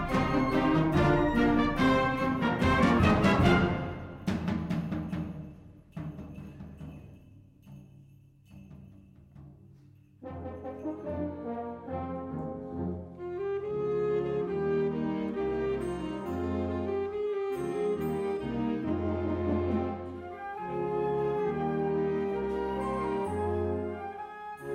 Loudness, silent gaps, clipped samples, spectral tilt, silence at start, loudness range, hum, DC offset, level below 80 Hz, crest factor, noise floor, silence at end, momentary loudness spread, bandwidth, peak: -30 LUFS; none; under 0.1%; -7.5 dB/octave; 0 s; 20 LU; none; under 0.1%; -46 dBFS; 20 dB; -57 dBFS; 0 s; 16 LU; 15 kHz; -10 dBFS